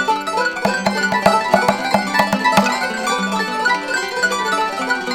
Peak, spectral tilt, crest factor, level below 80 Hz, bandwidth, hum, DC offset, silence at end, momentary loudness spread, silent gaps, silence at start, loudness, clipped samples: 0 dBFS; -3.5 dB/octave; 18 dB; -52 dBFS; 19 kHz; none; under 0.1%; 0 s; 5 LU; none; 0 s; -17 LUFS; under 0.1%